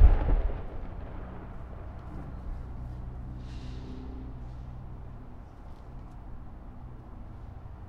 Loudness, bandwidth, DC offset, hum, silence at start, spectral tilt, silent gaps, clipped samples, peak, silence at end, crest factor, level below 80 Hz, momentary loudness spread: -39 LUFS; 5 kHz; under 0.1%; none; 0 s; -9 dB/octave; none; under 0.1%; -6 dBFS; 0 s; 24 dB; -32 dBFS; 11 LU